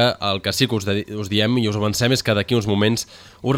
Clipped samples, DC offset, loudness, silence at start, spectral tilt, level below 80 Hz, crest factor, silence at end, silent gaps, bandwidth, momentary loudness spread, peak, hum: under 0.1%; under 0.1%; -20 LUFS; 0 s; -5 dB/octave; -50 dBFS; 18 dB; 0 s; none; 17 kHz; 6 LU; -2 dBFS; none